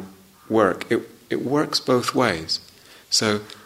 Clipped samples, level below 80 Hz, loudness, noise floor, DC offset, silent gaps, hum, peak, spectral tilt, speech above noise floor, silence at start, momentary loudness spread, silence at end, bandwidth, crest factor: under 0.1%; -60 dBFS; -22 LUFS; -43 dBFS; under 0.1%; none; none; -2 dBFS; -3.5 dB/octave; 21 dB; 0 s; 7 LU; 0.1 s; 16 kHz; 20 dB